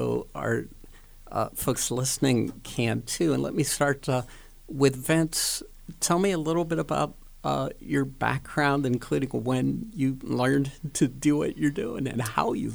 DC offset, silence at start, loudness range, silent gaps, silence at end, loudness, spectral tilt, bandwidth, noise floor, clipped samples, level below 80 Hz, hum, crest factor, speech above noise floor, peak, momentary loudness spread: under 0.1%; 0 s; 2 LU; none; 0 s; -27 LUFS; -5 dB/octave; over 20 kHz; -47 dBFS; under 0.1%; -48 dBFS; none; 20 dB; 21 dB; -8 dBFS; 7 LU